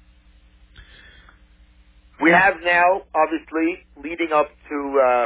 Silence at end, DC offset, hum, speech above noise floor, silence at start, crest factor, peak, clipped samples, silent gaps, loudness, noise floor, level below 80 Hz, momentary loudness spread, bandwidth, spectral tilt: 0 s; under 0.1%; none; 33 dB; 2.2 s; 18 dB; -4 dBFS; under 0.1%; none; -19 LUFS; -52 dBFS; -52 dBFS; 12 LU; 4 kHz; -8.5 dB/octave